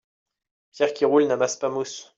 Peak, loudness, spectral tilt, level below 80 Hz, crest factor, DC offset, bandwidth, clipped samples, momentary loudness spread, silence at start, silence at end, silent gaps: -8 dBFS; -23 LUFS; -4 dB/octave; -74 dBFS; 16 dB; under 0.1%; 7.8 kHz; under 0.1%; 8 LU; 0.75 s; 0.15 s; none